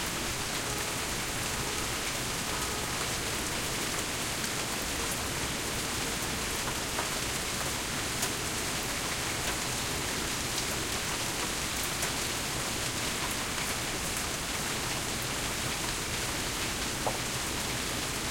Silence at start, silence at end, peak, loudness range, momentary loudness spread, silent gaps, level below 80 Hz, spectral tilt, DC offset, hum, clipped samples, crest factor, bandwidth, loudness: 0 s; 0 s; -14 dBFS; 1 LU; 1 LU; none; -46 dBFS; -2 dB/octave; under 0.1%; none; under 0.1%; 18 dB; 17 kHz; -31 LUFS